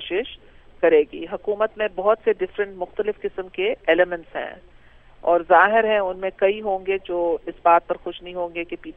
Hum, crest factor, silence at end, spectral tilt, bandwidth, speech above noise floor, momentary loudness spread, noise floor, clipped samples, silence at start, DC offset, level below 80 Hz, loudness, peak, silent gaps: none; 20 dB; 0.05 s; -7.5 dB/octave; 3.9 kHz; 26 dB; 13 LU; -48 dBFS; under 0.1%; 0 s; under 0.1%; -52 dBFS; -22 LUFS; -2 dBFS; none